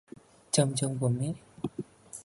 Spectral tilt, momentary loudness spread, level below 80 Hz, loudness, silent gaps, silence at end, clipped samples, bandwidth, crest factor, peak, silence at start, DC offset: -5 dB/octave; 14 LU; -64 dBFS; -31 LUFS; none; 0 s; under 0.1%; 11.5 kHz; 20 dB; -10 dBFS; 0.55 s; under 0.1%